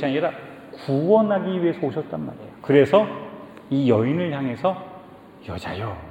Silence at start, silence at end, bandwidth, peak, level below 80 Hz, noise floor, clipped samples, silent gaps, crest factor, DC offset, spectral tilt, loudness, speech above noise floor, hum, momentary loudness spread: 0 s; 0 s; 9.4 kHz; -2 dBFS; -56 dBFS; -44 dBFS; under 0.1%; none; 20 dB; under 0.1%; -8.5 dB/octave; -22 LUFS; 22 dB; none; 19 LU